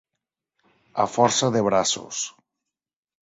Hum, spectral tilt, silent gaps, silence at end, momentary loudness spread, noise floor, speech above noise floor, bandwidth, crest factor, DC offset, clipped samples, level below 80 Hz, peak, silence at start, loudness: none; -3.5 dB/octave; none; 0.9 s; 11 LU; -85 dBFS; 63 dB; 8 kHz; 22 dB; under 0.1%; under 0.1%; -62 dBFS; -2 dBFS; 0.95 s; -22 LUFS